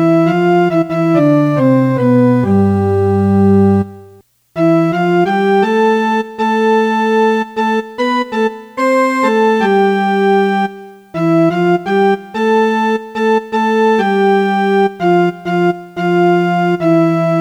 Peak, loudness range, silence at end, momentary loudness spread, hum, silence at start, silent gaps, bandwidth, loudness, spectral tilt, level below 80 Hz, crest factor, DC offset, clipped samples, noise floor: 0 dBFS; 2 LU; 0 s; 5 LU; none; 0 s; none; 12 kHz; -13 LUFS; -7.5 dB/octave; -58 dBFS; 12 dB; under 0.1%; under 0.1%; -43 dBFS